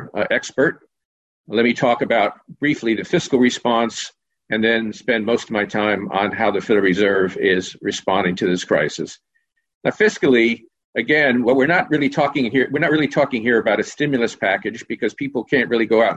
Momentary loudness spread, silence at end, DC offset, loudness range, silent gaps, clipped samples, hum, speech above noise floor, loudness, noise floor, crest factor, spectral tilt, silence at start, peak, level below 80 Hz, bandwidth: 9 LU; 0 s; under 0.1%; 3 LU; 1.05-1.44 s, 9.75-9.81 s, 10.84-10.93 s; under 0.1%; none; 51 dB; -18 LUFS; -69 dBFS; 14 dB; -5 dB/octave; 0 s; -4 dBFS; -56 dBFS; 8.6 kHz